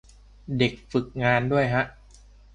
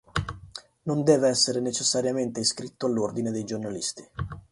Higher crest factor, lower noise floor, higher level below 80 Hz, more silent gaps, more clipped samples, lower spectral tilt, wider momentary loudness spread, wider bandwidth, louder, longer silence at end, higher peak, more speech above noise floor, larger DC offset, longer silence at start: about the same, 20 dB vs 20 dB; first, -51 dBFS vs -46 dBFS; about the same, -50 dBFS vs -50 dBFS; neither; neither; first, -7 dB/octave vs -4 dB/octave; second, 9 LU vs 16 LU; second, 9.4 kHz vs 11.5 kHz; about the same, -25 LUFS vs -26 LUFS; first, 0.65 s vs 0.1 s; about the same, -6 dBFS vs -6 dBFS; first, 27 dB vs 20 dB; neither; first, 0.5 s vs 0.15 s